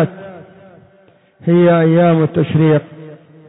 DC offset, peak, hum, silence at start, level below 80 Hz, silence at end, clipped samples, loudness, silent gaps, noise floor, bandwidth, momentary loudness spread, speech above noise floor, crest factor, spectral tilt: under 0.1%; -2 dBFS; none; 0 s; -56 dBFS; 0.35 s; under 0.1%; -13 LUFS; none; -50 dBFS; 4 kHz; 23 LU; 39 dB; 12 dB; -12.5 dB/octave